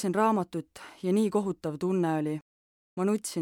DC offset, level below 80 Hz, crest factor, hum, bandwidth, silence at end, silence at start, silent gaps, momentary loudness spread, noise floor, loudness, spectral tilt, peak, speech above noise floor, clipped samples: under 0.1%; -70 dBFS; 16 dB; none; 17.5 kHz; 0 s; 0 s; 2.42-2.97 s; 13 LU; under -90 dBFS; -29 LUFS; -6.5 dB/octave; -14 dBFS; over 62 dB; under 0.1%